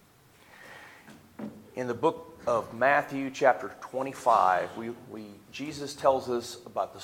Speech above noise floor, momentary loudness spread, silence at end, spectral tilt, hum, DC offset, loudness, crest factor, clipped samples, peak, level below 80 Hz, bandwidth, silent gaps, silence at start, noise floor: 30 dB; 19 LU; 0 s; -4.5 dB/octave; none; under 0.1%; -28 LUFS; 22 dB; under 0.1%; -8 dBFS; -70 dBFS; 17 kHz; none; 0.6 s; -58 dBFS